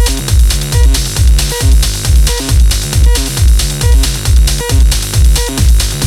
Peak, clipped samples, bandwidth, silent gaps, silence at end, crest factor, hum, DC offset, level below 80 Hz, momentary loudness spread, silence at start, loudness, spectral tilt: 0 dBFS; under 0.1%; 16 kHz; none; 0 s; 8 dB; none; under 0.1%; -10 dBFS; 1 LU; 0 s; -11 LUFS; -4 dB/octave